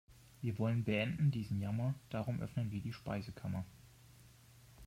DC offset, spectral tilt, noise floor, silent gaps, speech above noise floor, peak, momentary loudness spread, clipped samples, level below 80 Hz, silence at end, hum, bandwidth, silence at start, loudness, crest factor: under 0.1%; -7.5 dB/octave; -62 dBFS; none; 24 dB; -24 dBFS; 9 LU; under 0.1%; -64 dBFS; 0 s; none; 15.5 kHz; 0.1 s; -39 LUFS; 16 dB